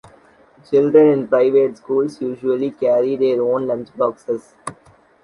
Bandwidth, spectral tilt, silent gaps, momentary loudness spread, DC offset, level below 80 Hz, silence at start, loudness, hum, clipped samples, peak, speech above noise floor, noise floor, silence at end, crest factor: 11 kHz; -7.5 dB/octave; none; 13 LU; under 0.1%; -62 dBFS; 0.7 s; -17 LUFS; none; under 0.1%; -2 dBFS; 33 dB; -50 dBFS; 0.5 s; 16 dB